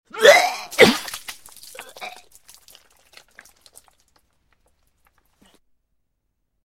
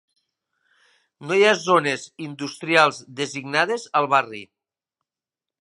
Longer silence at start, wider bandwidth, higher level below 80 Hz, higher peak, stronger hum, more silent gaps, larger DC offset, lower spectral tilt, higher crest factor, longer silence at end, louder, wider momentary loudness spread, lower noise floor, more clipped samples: second, 0.15 s vs 1.2 s; first, 16.5 kHz vs 11.5 kHz; first, -60 dBFS vs -76 dBFS; about the same, 0 dBFS vs 0 dBFS; neither; neither; neither; about the same, -2.5 dB/octave vs -3.5 dB/octave; about the same, 24 dB vs 22 dB; first, 4.55 s vs 1.15 s; first, -15 LUFS vs -21 LUFS; first, 26 LU vs 15 LU; second, -74 dBFS vs -90 dBFS; neither